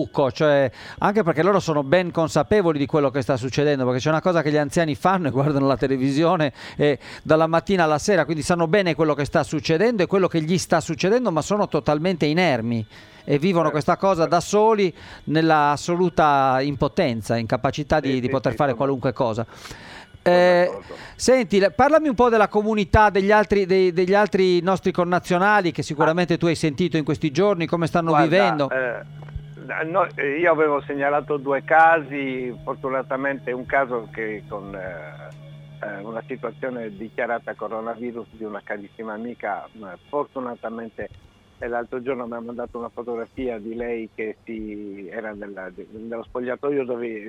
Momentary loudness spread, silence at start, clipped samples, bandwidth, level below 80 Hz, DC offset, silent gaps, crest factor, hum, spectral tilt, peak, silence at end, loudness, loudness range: 16 LU; 0 s; under 0.1%; 15.5 kHz; -46 dBFS; under 0.1%; none; 18 dB; none; -6 dB/octave; -2 dBFS; 0 s; -21 LUFS; 12 LU